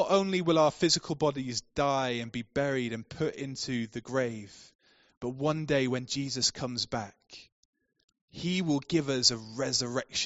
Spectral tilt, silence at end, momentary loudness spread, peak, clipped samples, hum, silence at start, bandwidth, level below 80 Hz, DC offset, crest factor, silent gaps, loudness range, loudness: -3.5 dB/octave; 0 s; 12 LU; -8 dBFS; under 0.1%; none; 0 s; 8 kHz; -62 dBFS; under 0.1%; 22 dB; 4.75-4.79 s, 5.17-5.21 s, 7.52-7.73 s, 8.04-8.08 s, 8.21-8.28 s; 5 LU; -30 LUFS